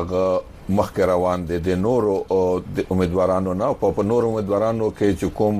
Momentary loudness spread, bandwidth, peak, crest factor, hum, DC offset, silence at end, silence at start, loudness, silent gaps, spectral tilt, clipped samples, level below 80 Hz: 4 LU; 15 kHz; -6 dBFS; 16 dB; none; under 0.1%; 0 s; 0 s; -21 LUFS; none; -7.5 dB/octave; under 0.1%; -42 dBFS